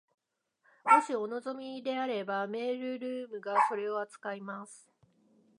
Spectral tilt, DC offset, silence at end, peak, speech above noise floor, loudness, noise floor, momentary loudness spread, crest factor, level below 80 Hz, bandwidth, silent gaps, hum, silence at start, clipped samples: -4.5 dB/octave; under 0.1%; 0.85 s; -10 dBFS; 43 dB; -32 LUFS; -76 dBFS; 15 LU; 24 dB; under -90 dBFS; 11 kHz; none; none; 0.85 s; under 0.1%